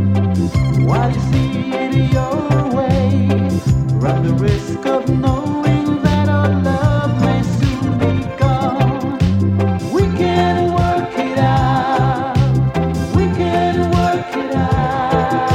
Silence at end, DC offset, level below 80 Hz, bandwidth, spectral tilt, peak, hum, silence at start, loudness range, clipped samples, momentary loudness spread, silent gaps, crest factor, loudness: 0 s; under 0.1%; -30 dBFS; 10.5 kHz; -7.5 dB/octave; 0 dBFS; none; 0 s; 1 LU; under 0.1%; 3 LU; none; 14 dB; -16 LUFS